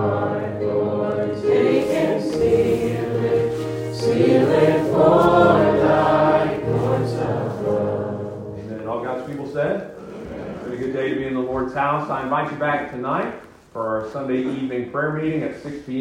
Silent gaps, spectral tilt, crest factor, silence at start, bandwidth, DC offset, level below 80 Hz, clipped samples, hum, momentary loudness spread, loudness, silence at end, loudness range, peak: none; -7.5 dB/octave; 18 dB; 0 s; 16 kHz; under 0.1%; -48 dBFS; under 0.1%; none; 14 LU; -20 LUFS; 0 s; 9 LU; -2 dBFS